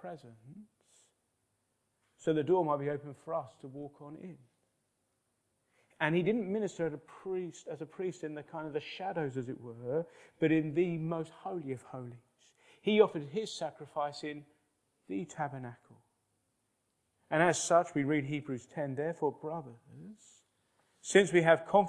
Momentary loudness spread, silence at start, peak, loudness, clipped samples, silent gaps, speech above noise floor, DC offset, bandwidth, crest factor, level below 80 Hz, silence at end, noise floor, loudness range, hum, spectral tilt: 20 LU; 0 s; -10 dBFS; -34 LUFS; under 0.1%; none; 46 dB; under 0.1%; 11 kHz; 24 dB; -78 dBFS; 0 s; -80 dBFS; 8 LU; none; -5.5 dB/octave